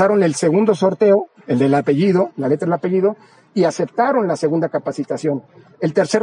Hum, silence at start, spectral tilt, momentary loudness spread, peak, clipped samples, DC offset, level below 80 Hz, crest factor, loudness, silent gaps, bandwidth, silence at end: none; 0 s; -6.5 dB/octave; 8 LU; -2 dBFS; under 0.1%; under 0.1%; -66 dBFS; 14 dB; -18 LUFS; none; 10.5 kHz; 0 s